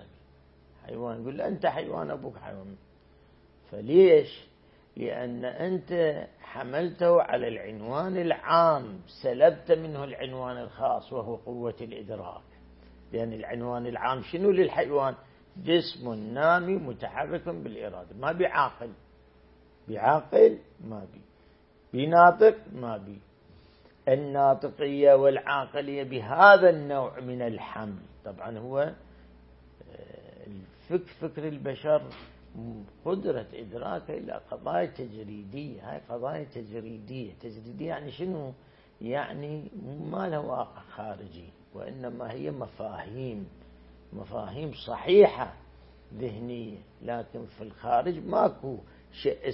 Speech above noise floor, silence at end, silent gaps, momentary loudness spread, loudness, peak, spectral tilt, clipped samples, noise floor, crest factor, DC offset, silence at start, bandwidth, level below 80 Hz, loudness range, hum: 32 dB; 0 s; none; 22 LU; -27 LUFS; -2 dBFS; -10 dB/octave; under 0.1%; -59 dBFS; 26 dB; under 0.1%; 0 s; 5.8 kHz; -60 dBFS; 14 LU; none